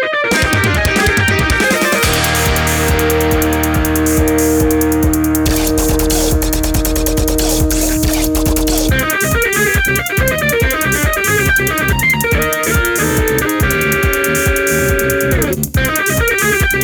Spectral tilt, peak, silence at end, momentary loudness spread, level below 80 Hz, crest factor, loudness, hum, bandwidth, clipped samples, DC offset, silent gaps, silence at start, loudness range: -4 dB/octave; 0 dBFS; 0 s; 2 LU; -22 dBFS; 12 dB; -13 LUFS; none; over 20 kHz; under 0.1%; under 0.1%; none; 0 s; 1 LU